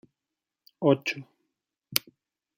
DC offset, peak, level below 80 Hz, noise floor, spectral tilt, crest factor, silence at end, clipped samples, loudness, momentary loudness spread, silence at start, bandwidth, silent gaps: under 0.1%; 0 dBFS; -74 dBFS; -88 dBFS; -4.5 dB/octave; 32 dB; 0.6 s; under 0.1%; -28 LUFS; 9 LU; 0.8 s; 16.5 kHz; none